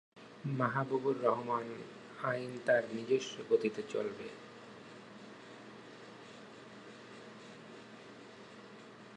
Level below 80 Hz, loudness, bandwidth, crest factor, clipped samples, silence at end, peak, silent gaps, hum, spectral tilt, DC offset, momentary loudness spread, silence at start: -82 dBFS; -36 LUFS; 11 kHz; 22 dB; under 0.1%; 0 s; -16 dBFS; none; none; -6 dB/octave; under 0.1%; 20 LU; 0.15 s